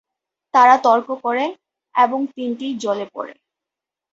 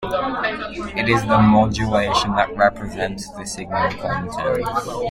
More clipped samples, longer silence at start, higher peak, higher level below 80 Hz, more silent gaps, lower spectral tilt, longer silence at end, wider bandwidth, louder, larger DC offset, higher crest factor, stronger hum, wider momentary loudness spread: neither; first, 0.55 s vs 0 s; about the same, -2 dBFS vs -2 dBFS; second, -72 dBFS vs -40 dBFS; neither; second, -4 dB/octave vs -5.5 dB/octave; first, 0.8 s vs 0 s; second, 7.8 kHz vs 15 kHz; about the same, -18 LUFS vs -20 LUFS; neither; about the same, 18 dB vs 18 dB; neither; first, 14 LU vs 11 LU